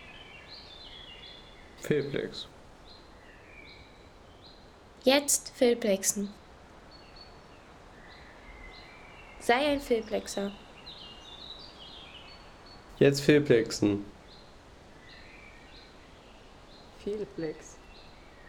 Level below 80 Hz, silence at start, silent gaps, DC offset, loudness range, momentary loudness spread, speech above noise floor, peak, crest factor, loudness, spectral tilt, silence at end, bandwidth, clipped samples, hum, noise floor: -56 dBFS; 0 s; none; under 0.1%; 14 LU; 27 LU; 26 dB; -8 dBFS; 24 dB; -28 LUFS; -4 dB/octave; 0 s; 19 kHz; under 0.1%; none; -53 dBFS